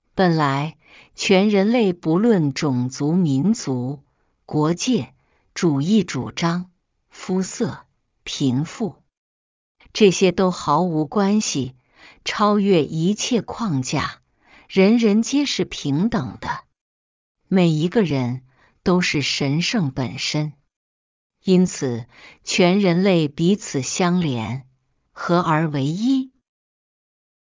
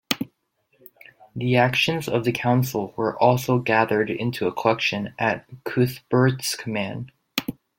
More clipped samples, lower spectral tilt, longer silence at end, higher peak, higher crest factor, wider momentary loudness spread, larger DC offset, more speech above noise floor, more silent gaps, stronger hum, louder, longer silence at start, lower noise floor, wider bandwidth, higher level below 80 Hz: neither; about the same, -5.5 dB/octave vs -5.5 dB/octave; first, 1.15 s vs 0.25 s; about the same, -2 dBFS vs -2 dBFS; about the same, 18 dB vs 20 dB; first, 13 LU vs 9 LU; neither; second, 35 dB vs 46 dB; first, 9.17-9.75 s, 16.81-17.35 s, 20.76-21.30 s vs none; neither; first, -20 LUFS vs -23 LUFS; about the same, 0.15 s vs 0.1 s; second, -54 dBFS vs -68 dBFS; second, 7.6 kHz vs 17 kHz; first, -54 dBFS vs -60 dBFS